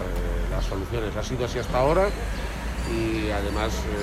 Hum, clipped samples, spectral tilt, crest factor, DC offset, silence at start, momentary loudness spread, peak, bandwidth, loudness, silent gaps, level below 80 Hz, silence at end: none; under 0.1%; -5.5 dB/octave; 16 dB; under 0.1%; 0 s; 9 LU; -10 dBFS; 15 kHz; -27 LUFS; none; -30 dBFS; 0 s